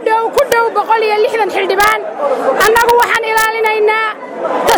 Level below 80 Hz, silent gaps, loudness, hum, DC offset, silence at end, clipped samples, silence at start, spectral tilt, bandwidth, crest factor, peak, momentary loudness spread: -46 dBFS; none; -12 LUFS; none; under 0.1%; 0 s; under 0.1%; 0 s; -2 dB/octave; over 20 kHz; 12 dB; 0 dBFS; 6 LU